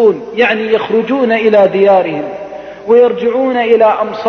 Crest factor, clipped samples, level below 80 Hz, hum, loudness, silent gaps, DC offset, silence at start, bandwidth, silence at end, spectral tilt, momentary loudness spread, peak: 10 dB; under 0.1%; -54 dBFS; none; -11 LUFS; none; under 0.1%; 0 s; 6.4 kHz; 0 s; -7 dB/octave; 12 LU; 0 dBFS